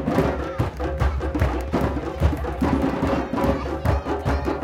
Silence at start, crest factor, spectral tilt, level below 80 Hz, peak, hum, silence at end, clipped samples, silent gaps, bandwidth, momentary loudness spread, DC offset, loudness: 0 s; 18 dB; -7.5 dB/octave; -28 dBFS; -4 dBFS; none; 0 s; under 0.1%; none; 15.5 kHz; 3 LU; under 0.1%; -24 LUFS